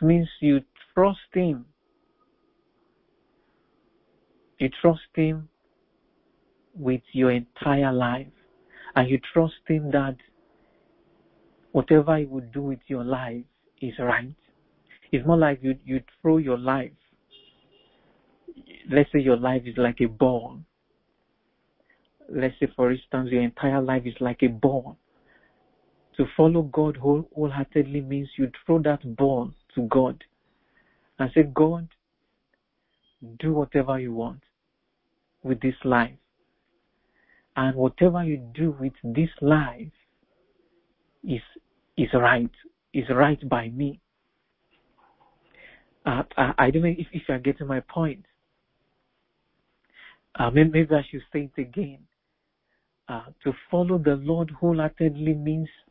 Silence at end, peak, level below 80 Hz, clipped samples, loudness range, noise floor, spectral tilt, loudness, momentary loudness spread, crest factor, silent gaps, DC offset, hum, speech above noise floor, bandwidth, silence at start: 0.25 s; -4 dBFS; -50 dBFS; under 0.1%; 4 LU; -77 dBFS; -12 dB/octave; -24 LUFS; 12 LU; 22 dB; none; under 0.1%; none; 54 dB; 4.4 kHz; 0 s